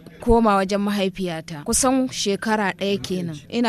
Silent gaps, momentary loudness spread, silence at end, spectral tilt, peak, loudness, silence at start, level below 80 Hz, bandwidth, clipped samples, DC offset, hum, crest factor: none; 10 LU; 0 s; -4 dB/octave; -4 dBFS; -21 LUFS; 0.05 s; -38 dBFS; 15 kHz; under 0.1%; under 0.1%; none; 16 dB